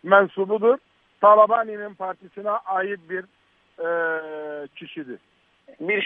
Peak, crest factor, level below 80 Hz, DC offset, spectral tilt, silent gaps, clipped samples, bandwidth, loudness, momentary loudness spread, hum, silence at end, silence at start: -2 dBFS; 20 dB; -78 dBFS; under 0.1%; -8 dB/octave; none; under 0.1%; 3.8 kHz; -22 LUFS; 20 LU; none; 0 s; 0.05 s